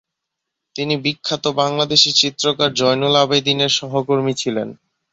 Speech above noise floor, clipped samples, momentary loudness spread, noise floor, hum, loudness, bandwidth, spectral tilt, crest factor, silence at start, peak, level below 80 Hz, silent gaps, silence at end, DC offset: 62 dB; under 0.1%; 10 LU; -80 dBFS; none; -16 LUFS; 8.2 kHz; -3.5 dB/octave; 18 dB; 0.75 s; 0 dBFS; -60 dBFS; none; 0.4 s; under 0.1%